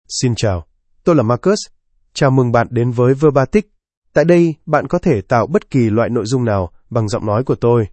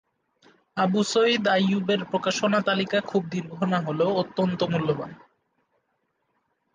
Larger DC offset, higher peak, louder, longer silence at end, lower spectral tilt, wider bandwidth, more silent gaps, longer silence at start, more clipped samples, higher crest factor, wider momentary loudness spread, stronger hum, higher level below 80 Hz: neither; first, 0 dBFS vs -10 dBFS; first, -15 LUFS vs -24 LUFS; second, 0.05 s vs 1.6 s; first, -6.5 dB/octave vs -5 dB/octave; about the same, 8.8 kHz vs 9.6 kHz; first, 3.97-4.02 s vs none; second, 0.1 s vs 0.75 s; neither; about the same, 14 dB vs 16 dB; about the same, 8 LU vs 7 LU; neither; first, -42 dBFS vs -66 dBFS